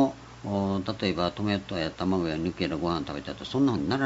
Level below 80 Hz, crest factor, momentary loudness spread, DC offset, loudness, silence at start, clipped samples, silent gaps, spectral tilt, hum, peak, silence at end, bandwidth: -52 dBFS; 18 dB; 6 LU; under 0.1%; -29 LUFS; 0 s; under 0.1%; none; -6.5 dB/octave; none; -10 dBFS; 0 s; 8 kHz